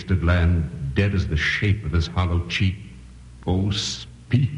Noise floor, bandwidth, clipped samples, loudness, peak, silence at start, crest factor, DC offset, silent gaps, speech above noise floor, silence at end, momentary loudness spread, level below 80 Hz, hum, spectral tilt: -42 dBFS; 10 kHz; under 0.1%; -23 LUFS; -6 dBFS; 0 s; 16 dB; under 0.1%; none; 21 dB; 0 s; 8 LU; -32 dBFS; none; -6 dB/octave